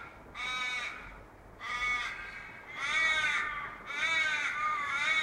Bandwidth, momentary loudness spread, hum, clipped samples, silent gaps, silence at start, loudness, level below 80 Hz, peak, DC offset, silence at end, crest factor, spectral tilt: 16 kHz; 16 LU; none; under 0.1%; none; 0 s; -31 LUFS; -60 dBFS; -18 dBFS; under 0.1%; 0 s; 16 dB; -0.5 dB/octave